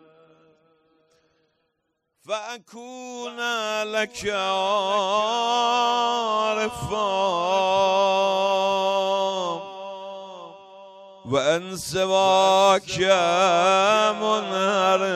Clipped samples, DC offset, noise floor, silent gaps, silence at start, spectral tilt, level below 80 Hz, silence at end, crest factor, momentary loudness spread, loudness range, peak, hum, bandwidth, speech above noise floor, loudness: under 0.1%; under 0.1%; -76 dBFS; none; 2.3 s; -3 dB/octave; -60 dBFS; 0 s; 18 dB; 18 LU; 11 LU; -6 dBFS; none; 14 kHz; 54 dB; -21 LUFS